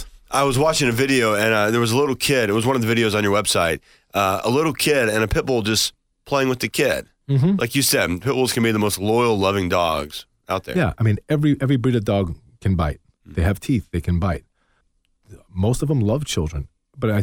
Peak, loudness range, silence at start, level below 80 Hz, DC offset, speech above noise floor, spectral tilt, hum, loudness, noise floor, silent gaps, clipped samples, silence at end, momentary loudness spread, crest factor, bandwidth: -4 dBFS; 6 LU; 0 s; -38 dBFS; under 0.1%; 46 dB; -5 dB/octave; none; -20 LUFS; -65 dBFS; none; under 0.1%; 0 s; 9 LU; 16 dB; 18 kHz